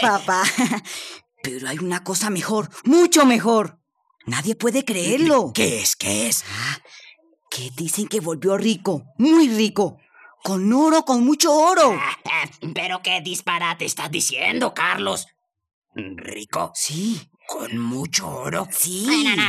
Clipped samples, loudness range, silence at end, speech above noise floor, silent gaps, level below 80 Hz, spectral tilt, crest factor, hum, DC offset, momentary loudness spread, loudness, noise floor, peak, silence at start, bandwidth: under 0.1%; 6 LU; 0 s; 30 dB; 15.73-15.82 s; -68 dBFS; -3 dB/octave; 18 dB; none; under 0.1%; 16 LU; -20 LUFS; -51 dBFS; -4 dBFS; 0 s; 15.5 kHz